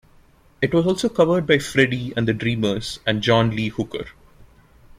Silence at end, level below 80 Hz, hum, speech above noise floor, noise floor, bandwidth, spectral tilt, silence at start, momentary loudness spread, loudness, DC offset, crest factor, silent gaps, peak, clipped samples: 0.55 s; -48 dBFS; none; 33 dB; -53 dBFS; 15.5 kHz; -5.5 dB/octave; 0.6 s; 9 LU; -20 LUFS; under 0.1%; 20 dB; none; -2 dBFS; under 0.1%